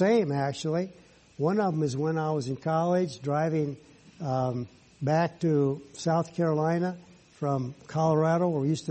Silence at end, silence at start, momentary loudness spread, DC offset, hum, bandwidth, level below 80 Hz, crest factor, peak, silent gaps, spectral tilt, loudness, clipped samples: 0 s; 0 s; 9 LU; under 0.1%; none; 8.4 kHz; -66 dBFS; 16 dB; -12 dBFS; none; -7 dB/octave; -28 LUFS; under 0.1%